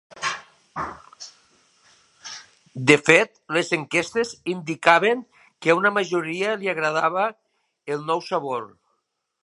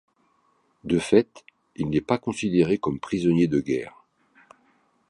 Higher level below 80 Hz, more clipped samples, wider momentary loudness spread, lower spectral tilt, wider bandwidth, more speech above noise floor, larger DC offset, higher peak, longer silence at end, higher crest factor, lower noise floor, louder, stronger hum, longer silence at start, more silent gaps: second, -64 dBFS vs -54 dBFS; neither; first, 23 LU vs 11 LU; second, -4 dB/octave vs -7 dB/octave; about the same, 11.5 kHz vs 11.5 kHz; first, 54 dB vs 43 dB; neither; first, 0 dBFS vs -4 dBFS; second, 0.75 s vs 1.2 s; about the same, 24 dB vs 20 dB; first, -75 dBFS vs -66 dBFS; about the same, -22 LUFS vs -24 LUFS; neither; second, 0.15 s vs 0.85 s; neither